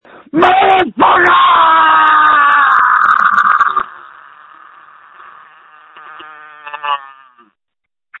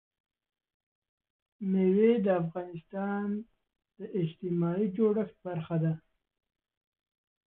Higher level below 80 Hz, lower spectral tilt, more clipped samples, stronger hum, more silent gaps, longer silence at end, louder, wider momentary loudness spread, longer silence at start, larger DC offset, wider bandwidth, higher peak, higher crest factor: first, -54 dBFS vs -72 dBFS; second, -4.5 dB/octave vs -12 dB/octave; neither; neither; neither; second, 1.15 s vs 1.5 s; first, -9 LUFS vs -31 LUFS; about the same, 12 LU vs 14 LU; second, 0.35 s vs 1.6 s; neither; first, 7.6 kHz vs 3.9 kHz; first, 0 dBFS vs -14 dBFS; second, 12 dB vs 18 dB